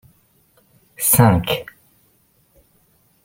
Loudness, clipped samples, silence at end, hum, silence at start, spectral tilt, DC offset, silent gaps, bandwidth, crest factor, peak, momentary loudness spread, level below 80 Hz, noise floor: -16 LUFS; under 0.1%; 1.6 s; none; 1 s; -4.5 dB/octave; under 0.1%; none; 16.5 kHz; 20 dB; -2 dBFS; 14 LU; -46 dBFS; -59 dBFS